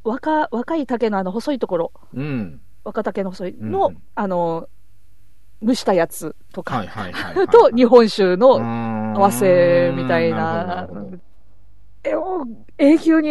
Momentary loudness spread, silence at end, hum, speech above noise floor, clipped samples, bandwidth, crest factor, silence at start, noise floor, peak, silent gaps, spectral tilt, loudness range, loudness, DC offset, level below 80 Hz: 17 LU; 0 s; none; 37 dB; under 0.1%; 12.5 kHz; 18 dB; 0.05 s; -55 dBFS; 0 dBFS; none; -6 dB/octave; 10 LU; -18 LUFS; 2%; -54 dBFS